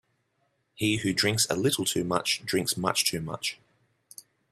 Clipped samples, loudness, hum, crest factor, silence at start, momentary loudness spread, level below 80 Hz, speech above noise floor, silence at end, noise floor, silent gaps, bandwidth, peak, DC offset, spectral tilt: under 0.1%; -27 LUFS; none; 22 dB; 0.8 s; 7 LU; -64 dBFS; 46 dB; 1 s; -74 dBFS; none; 15.5 kHz; -8 dBFS; under 0.1%; -3 dB/octave